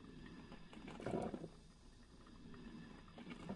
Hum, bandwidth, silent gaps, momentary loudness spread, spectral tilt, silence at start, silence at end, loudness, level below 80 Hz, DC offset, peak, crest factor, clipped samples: none; 11 kHz; none; 19 LU; -6.5 dB/octave; 0 s; 0 s; -52 LUFS; -64 dBFS; under 0.1%; -28 dBFS; 24 dB; under 0.1%